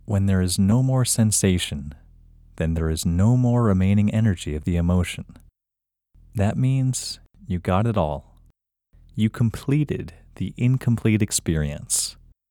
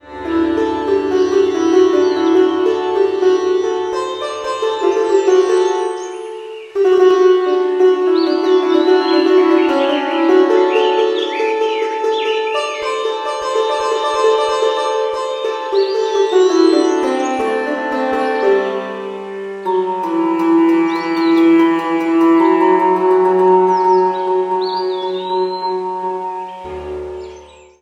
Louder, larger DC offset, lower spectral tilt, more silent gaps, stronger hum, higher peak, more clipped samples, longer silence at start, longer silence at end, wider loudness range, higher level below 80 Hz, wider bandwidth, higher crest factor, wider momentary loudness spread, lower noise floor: second, -22 LUFS vs -15 LUFS; neither; about the same, -5.5 dB/octave vs -4.5 dB/octave; neither; neither; second, -6 dBFS vs 0 dBFS; neither; about the same, 0.1 s vs 0.05 s; about the same, 0.4 s vs 0.35 s; about the same, 4 LU vs 5 LU; first, -40 dBFS vs -52 dBFS; first, 17.5 kHz vs 9.4 kHz; about the same, 16 dB vs 14 dB; first, 13 LU vs 10 LU; first, -85 dBFS vs -39 dBFS